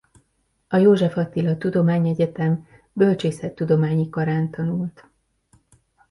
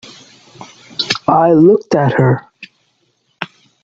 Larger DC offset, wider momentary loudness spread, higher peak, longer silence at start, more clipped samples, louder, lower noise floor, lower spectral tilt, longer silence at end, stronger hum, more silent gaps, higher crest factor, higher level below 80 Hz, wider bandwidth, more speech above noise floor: neither; second, 10 LU vs 19 LU; second, -4 dBFS vs 0 dBFS; about the same, 0.7 s vs 0.6 s; neither; second, -21 LUFS vs -12 LUFS; first, -68 dBFS vs -62 dBFS; first, -8.5 dB/octave vs -6.5 dB/octave; first, 1.2 s vs 0.4 s; neither; neither; about the same, 16 dB vs 14 dB; about the same, -58 dBFS vs -56 dBFS; first, 11.5 kHz vs 7.8 kHz; about the same, 48 dB vs 51 dB